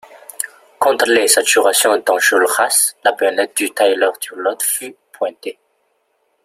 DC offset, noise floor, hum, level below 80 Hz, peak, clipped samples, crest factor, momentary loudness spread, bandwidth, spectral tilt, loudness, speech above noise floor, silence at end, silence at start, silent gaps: under 0.1%; -64 dBFS; none; -68 dBFS; 0 dBFS; under 0.1%; 16 dB; 14 LU; 16 kHz; 0.5 dB/octave; -15 LUFS; 49 dB; 0.95 s; 0.1 s; none